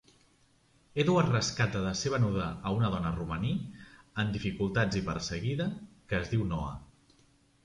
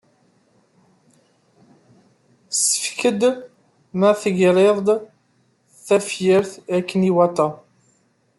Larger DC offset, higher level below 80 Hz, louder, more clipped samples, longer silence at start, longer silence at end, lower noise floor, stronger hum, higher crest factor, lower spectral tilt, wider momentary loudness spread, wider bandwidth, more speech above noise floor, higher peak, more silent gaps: neither; first, -50 dBFS vs -66 dBFS; second, -31 LUFS vs -19 LUFS; neither; second, 0.95 s vs 2.5 s; about the same, 0.8 s vs 0.8 s; first, -66 dBFS vs -62 dBFS; neither; about the same, 20 dB vs 18 dB; about the same, -5.5 dB/octave vs -4.5 dB/octave; first, 11 LU vs 8 LU; second, 11 kHz vs 12.5 kHz; second, 36 dB vs 45 dB; second, -12 dBFS vs -4 dBFS; neither